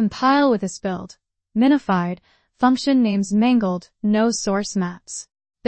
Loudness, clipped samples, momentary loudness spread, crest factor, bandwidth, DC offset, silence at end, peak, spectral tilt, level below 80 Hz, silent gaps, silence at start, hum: -20 LUFS; under 0.1%; 15 LU; 16 dB; 8.8 kHz; under 0.1%; 0.45 s; -4 dBFS; -5.5 dB/octave; -56 dBFS; none; 0 s; none